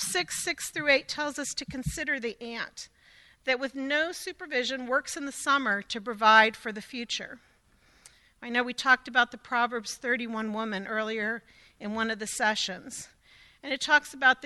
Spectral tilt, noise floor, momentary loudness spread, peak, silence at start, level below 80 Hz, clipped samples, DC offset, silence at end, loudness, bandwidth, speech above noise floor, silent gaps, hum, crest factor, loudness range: -2 dB/octave; -63 dBFS; 14 LU; -6 dBFS; 0 s; -58 dBFS; under 0.1%; under 0.1%; 0 s; -28 LUFS; 12.5 kHz; 34 dB; none; none; 24 dB; 6 LU